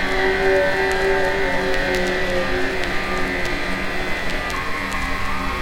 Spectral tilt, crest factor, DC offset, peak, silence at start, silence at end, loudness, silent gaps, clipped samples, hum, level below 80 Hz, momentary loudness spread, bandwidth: -4.5 dB/octave; 18 dB; 2%; -4 dBFS; 0 s; 0 s; -21 LUFS; none; under 0.1%; none; -30 dBFS; 6 LU; 16.5 kHz